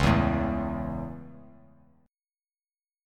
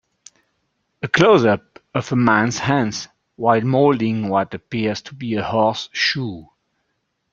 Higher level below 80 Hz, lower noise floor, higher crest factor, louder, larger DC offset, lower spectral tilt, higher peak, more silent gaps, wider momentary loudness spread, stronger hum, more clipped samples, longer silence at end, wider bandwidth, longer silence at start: first, -40 dBFS vs -56 dBFS; first, under -90 dBFS vs -72 dBFS; about the same, 22 dB vs 18 dB; second, -29 LUFS vs -18 LUFS; neither; first, -7 dB/octave vs -5.5 dB/octave; second, -8 dBFS vs -2 dBFS; neither; first, 20 LU vs 12 LU; neither; neither; first, 1.65 s vs 0.9 s; first, 13.5 kHz vs 7.6 kHz; second, 0 s vs 1.05 s